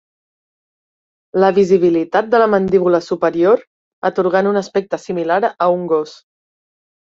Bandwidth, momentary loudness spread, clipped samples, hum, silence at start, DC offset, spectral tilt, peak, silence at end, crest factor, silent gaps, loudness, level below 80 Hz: 7.6 kHz; 8 LU; under 0.1%; none; 1.35 s; under 0.1%; -7 dB/octave; -2 dBFS; 0.85 s; 14 dB; 3.67-4.02 s; -15 LUFS; -58 dBFS